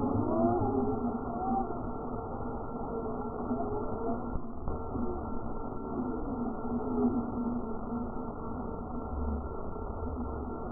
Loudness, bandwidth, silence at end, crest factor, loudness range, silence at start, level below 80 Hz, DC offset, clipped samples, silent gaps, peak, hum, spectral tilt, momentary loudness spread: -35 LUFS; 1.6 kHz; 0 s; 16 dB; 3 LU; 0 s; -42 dBFS; under 0.1%; under 0.1%; none; -18 dBFS; none; -14.5 dB/octave; 9 LU